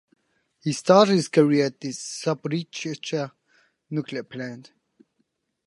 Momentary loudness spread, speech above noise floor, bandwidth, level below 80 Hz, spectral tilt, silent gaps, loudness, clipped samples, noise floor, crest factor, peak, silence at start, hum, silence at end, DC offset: 18 LU; 51 dB; 11.5 kHz; -74 dBFS; -5.5 dB/octave; none; -23 LUFS; under 0.1%; -74 dBFS; 22 dB; -2 dBFS; 0.65 s; none; 1.05 s; under 0.1%